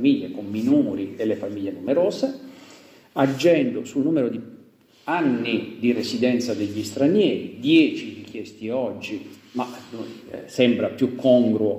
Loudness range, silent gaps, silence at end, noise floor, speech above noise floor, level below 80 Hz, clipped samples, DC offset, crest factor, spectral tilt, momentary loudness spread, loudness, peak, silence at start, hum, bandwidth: 3 LU; none; 0 s; -53 dBFS; 31 dB; -70 dBFS; under 0.1%; under 0.1%; 18 dB; -6 dB/octave; 17 LU; -22 LUFS; -4 dBFS; 0 s; none; 15.5 kHz